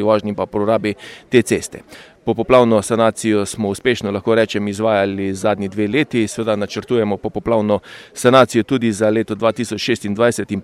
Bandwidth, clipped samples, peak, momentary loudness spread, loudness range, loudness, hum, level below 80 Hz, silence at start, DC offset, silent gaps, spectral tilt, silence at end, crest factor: 14.5 kHz; under 0.1%; 0 dBFS; 9 LU; 2 LU; -17 LUFS; none; -50 dBFS; 0 s; under 0.1%; none; -5.5 dB/octave; 0 s; 16 dB